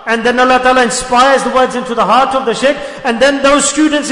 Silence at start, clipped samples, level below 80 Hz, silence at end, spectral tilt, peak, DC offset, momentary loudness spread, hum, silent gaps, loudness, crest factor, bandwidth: 0 s; under 0.1%; -40 dBFS; 0 s; -2.5 dB/octave; 0 dBFS; under 0.1%; 5 LU; none; none; -10 LUFS; 10 dB; 11 kHz